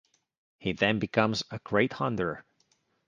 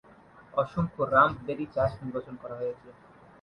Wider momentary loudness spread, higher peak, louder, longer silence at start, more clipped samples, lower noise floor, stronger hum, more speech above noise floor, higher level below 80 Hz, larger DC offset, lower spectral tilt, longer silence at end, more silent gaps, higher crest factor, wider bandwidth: second, 8 LU vs 15 LU; about the same, -8 dBFS vs -8 dBFS; about the same, -29 LUFS vs -29 LUFS; about the same, 0.6 s vs 0.55 s; neither; first, -71 dBFS vs -54 dBFS; neither; first, 43 dB vs 26 dB; second, -60 dBFS vs -54 dBFS; neither; second, -5.5 dB/octave vs -8.5 dB/octave; first, 0.65 s vs 0.5 s; neither; about the same, 24 dB vs 22 dB; about the same, 9.4 kHz vs 9.4 kHz